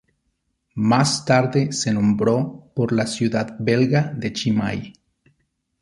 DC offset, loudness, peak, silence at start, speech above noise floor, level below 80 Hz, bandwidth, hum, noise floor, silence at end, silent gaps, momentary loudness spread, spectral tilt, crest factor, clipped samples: under 0.1%; -20 LUFS; -2 dBFS; 0.75 s; 52 dB; -54 dBFS; 11.5 kHz; none; -72 dBFS; 0.9 s; none; 9 LU; -5.5 dB/octave; 18 dB; under 0.1%